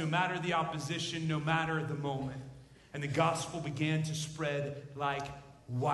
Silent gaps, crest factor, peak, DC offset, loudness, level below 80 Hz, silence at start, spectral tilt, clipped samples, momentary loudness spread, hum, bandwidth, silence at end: none; 20 dB; -16 dBFS; under 0.1%; -35 LUFS; -64 dBFS; 0 s; -5 dB/octave; under 0.1%; 10 LU; none; 12 kHz; 0 s